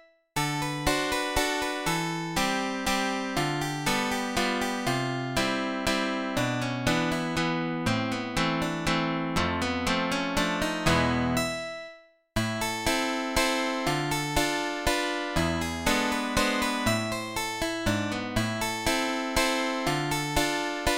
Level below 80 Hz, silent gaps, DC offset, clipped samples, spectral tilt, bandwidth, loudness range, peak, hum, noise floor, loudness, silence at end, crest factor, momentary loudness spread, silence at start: -44 dBFS; none; 0.1%; under 0.1%; -4 dB/octave; 17 kHz; 1 LU; -8 dBFS; none; -51 dBFS; -27 LUFS; 0 s; 20 dB; 3 LU; 0.35 s